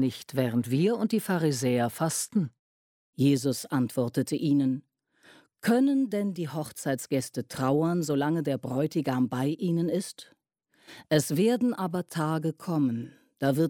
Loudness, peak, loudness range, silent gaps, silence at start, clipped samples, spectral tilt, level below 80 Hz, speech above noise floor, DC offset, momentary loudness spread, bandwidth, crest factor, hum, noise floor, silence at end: -28 LUFS; -10 dBFS; 2 LU; 2.59-3.13 s; 0 s; under 0.1%; -6 dB/octave; -70 dBFS; 42 dB; under 0.1%; 8 LU; 17.5 kHz; 18 dB; none; -69 dBFS; 0 s